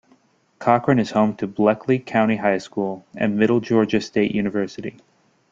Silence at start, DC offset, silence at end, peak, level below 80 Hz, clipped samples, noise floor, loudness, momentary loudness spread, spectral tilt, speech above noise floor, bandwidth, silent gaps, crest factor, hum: 0.6 s; under 0.1%; 0.6 s; -2 dBFS; -58 dBFS; under 0.1%; -59 dBFS; -20 LUFS; 9 LU; -7 dB/octave; 39 dB; 7.6 kHz; none; 18 dB; none